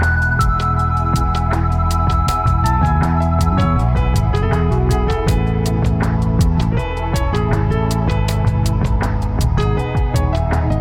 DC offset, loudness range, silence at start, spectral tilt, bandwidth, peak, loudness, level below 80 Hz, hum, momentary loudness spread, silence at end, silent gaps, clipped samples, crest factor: under 0.1%; 2 LU; 0 s; -7 dB/octave; 16 kHz; -4 dBFS; -17 LUFS; -20 dBFS; none; 3 LU; 0 s; none; under 0.1%; 12 dB